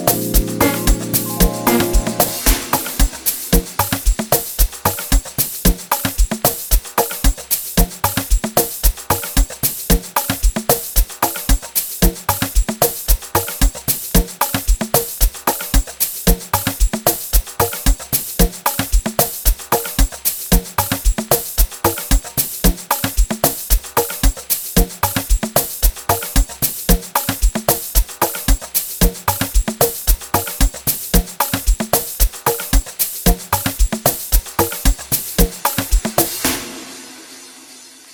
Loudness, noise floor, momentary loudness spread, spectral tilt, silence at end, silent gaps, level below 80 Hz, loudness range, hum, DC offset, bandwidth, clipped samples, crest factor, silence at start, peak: -17 LUFS; -40 dBFS; 4 LU; -3.5 dB/octave; 0 s; none; -20 dBFS; 1 LU; none; under 0.1%; over 20 kHz; under 0.1%; 16 dB; 0 s; 0 dBFS